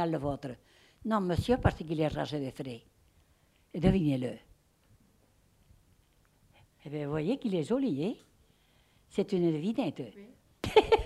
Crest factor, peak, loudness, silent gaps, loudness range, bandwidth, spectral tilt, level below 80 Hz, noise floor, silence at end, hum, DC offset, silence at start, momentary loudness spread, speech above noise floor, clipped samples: 24 dB; -8 dBFS; -32 LUFS; none; 6 LU; 14.5 kHz; -7 dB/octave; -50 dBFS; -67 dBFS; 0 s; none; under 0.1%; 0 s; 17 LU; 37 dB; under 0.1%